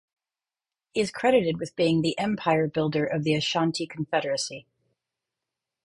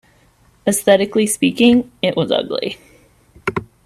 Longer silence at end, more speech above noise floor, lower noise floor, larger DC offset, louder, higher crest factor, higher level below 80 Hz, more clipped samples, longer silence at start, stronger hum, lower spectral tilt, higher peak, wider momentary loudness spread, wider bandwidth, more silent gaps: first, 1.25 s vs 0.2 s; first, over 65 dB vs 38 dB; first, under -90 dBFS vs -53 dBFS; neither; second, -26 LUFS vs -17 LUFS; about the same, 18 dB vs 18 dB; second, -64 dBFS vs -52 dBFS; neither; first, 0.95 s vs 0.65 s; neither; about the same, -5 dB/octave vs -4 dB/octave; second, -8 dBFS vs 0 dBFS; second, 8 LU vs 11 LU; second, 11.5 kHz vs 15.5 kHz; neither